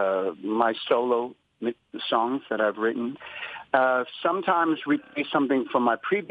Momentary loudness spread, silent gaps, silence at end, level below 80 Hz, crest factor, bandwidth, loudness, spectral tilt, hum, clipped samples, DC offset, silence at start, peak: 10 LU; none; 0 s; -78 dBFS; 18 dB; 5 kHz; -26 LUFS; -7 dB/octave; none; under 0.1%; under 0.1%; 0 s; -6 dBFS